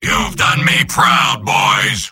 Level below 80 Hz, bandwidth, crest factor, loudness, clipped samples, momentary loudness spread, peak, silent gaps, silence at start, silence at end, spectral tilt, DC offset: -36 dBFS; 17 kHz; 14 dB; -12 LUFS; under 0.1%; 3 LU; 0 dBFS; none; 0 s; 0 s; -2.5 dB/octave; under 0.1%